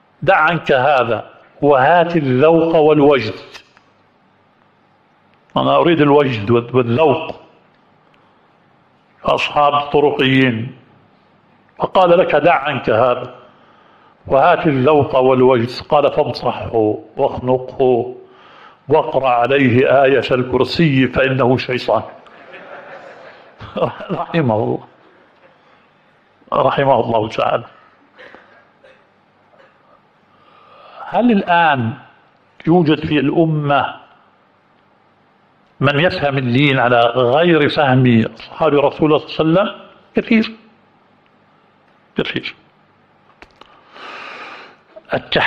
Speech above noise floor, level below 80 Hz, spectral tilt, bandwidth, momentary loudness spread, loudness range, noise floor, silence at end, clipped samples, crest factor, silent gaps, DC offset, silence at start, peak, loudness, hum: 40 dB; -50 dBFS; -8 dB/octave; 8 kHz; 13 LU; 9 LU; -54 dBFS; 0 s; under 0.1%; 16 dB; none; under 0.1%; 0.2 s; 0 dBFS; -15 LUFS; none